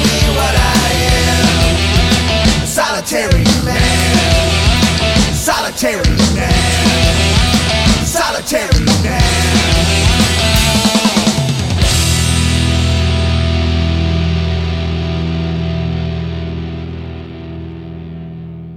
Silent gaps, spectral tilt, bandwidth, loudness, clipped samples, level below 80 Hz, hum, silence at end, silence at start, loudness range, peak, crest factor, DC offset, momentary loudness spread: none; -4 dB/octave; 16.5 kHz; -12 LUFS; under 0.1%; -20 dBFS; none; 0 s; 0 s; 7 LU; 0 dBFS; 12 dB; under 0.1%; 12 LU